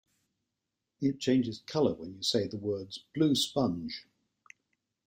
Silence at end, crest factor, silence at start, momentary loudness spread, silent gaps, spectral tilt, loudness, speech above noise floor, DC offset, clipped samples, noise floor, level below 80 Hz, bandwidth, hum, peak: 1.05 s; 18 dB; 1 s; 11 LU; none; -5 dB/octave; -31 LUFS; 56 dB; under 0.1%; under 0.1%; -86 dBFS; -68 dBFS; 16 kHz; none; -14 dBFS